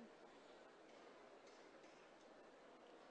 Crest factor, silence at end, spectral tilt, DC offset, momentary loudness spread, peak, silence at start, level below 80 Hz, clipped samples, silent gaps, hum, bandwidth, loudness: 14 dB; 0 s; -3.5 dB/octave; under 0.1%; 1 LU; -50 dBFS; 0 s; under -90 dBFS; under 0.1%; none; none; 9 kHz; -64 LUFS